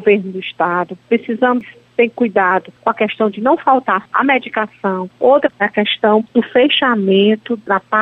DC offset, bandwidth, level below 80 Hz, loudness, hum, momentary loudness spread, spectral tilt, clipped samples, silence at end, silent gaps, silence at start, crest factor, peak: under 0.1%; 4.4 kHz; -62 dBFS; -15 LUFS; none; 7 LU; -7.5 dB/octave; under 0.1%; 0 s; none; 0 s; 14 dB; -2 dBFS